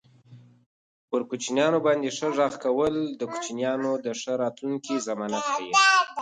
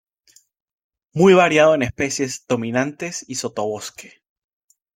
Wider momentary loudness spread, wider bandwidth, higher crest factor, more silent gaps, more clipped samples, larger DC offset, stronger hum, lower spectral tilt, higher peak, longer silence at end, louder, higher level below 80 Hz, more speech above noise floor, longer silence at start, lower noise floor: second, 11 LU vs 16 LU; second, 9.6 kHz vs 15.5 kHz; about the same, 20 dB vs 18 dB; first, 0.66-1.08 s vs none; neither; neither; neither; second, -3 dB/octave vs -4.5 dB/octave; second, -6 dBFS vs -2 dBFS; second, 0 s vs 0.95 s; second, -25 LUFS vs -18 LUFS; second, -68 dBFS vs -56 dBFS; second, 27 dB vs 38 dB; second, 0.3 s vs 1.15 s; second, -52 dBFS vs -57 dBFS